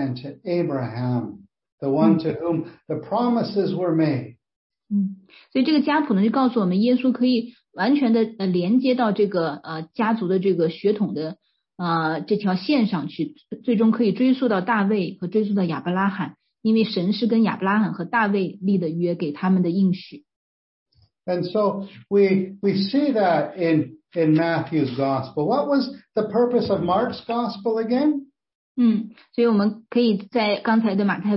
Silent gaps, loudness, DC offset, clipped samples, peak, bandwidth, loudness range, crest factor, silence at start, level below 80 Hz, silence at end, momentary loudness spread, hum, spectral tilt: 1.72-1.78 s, 4.56-4.70 s, 20.36-20.86 s, 28.55-28.75 s; -22 LUFS; under 0.1%; under 0.1%; -4 dBFS; 5.8 kHz; 3 LU; 16 dB; 0 s; -66 dBFS; 0 s; 9 LU; none; -11.5 dB/octave